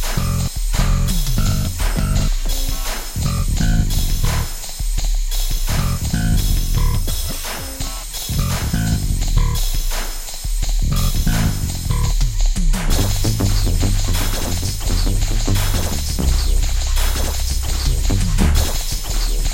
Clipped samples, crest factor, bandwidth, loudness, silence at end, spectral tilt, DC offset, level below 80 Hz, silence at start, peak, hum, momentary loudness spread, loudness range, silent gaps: under 0.1%; 14 dB; 16 kHz; -21 LUFS; 0 s; -4 dB/octave; under 0.1%; -18 dBFS; 0 s; -4 dBFS; none; 5 LU; 2 LU; none